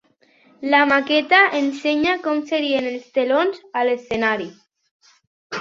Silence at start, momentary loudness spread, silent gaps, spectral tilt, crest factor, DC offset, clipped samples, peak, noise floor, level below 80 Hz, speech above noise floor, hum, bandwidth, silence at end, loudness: 0.6 s; 9 LU; 4.91-5.00 s, 5.27-5.50 s; -4 dB/octave; 18 dB; under 0.1%; under 0.1%; -2 dBFS; -56 dBFS; -62 dBFS; 37 dB; none; 7.6 kHz; 0 s; -19 LUFS